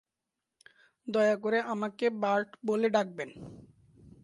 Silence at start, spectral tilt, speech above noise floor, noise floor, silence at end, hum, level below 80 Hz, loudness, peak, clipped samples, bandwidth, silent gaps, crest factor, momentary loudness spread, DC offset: 1.05 s; -5.5 dB/octave; 58 dB; -88 dBFS; 0.6 s; none; -70 dBFS; -30 LUFS; -12 dBFS; under 0.1%; 11.5 kHz; none; 20 dB; 16 LU; under 0.1%